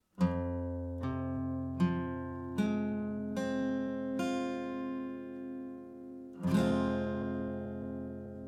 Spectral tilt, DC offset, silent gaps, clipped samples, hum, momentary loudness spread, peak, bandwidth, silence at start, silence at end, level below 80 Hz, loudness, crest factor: -7.5 dB/octave; under 0.1%; none; under 0.1%; none; 11 LU; -18 dBFS; 13 kHz; 0.15 s; 0 s; -56 dBFS; -36 LUFS; 18 dB